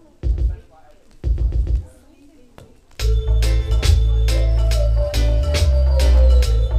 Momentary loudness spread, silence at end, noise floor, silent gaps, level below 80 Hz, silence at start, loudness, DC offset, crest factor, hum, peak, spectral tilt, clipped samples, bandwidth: 10 LU; 0 s; -47 dBFS; none; -18 dBFS; 0.25 s; -19 LUFS; under 0.1%; 14 dB; none; -4 dBFS; -5.5 dB/octave; under 0.1%; 12.5 kHz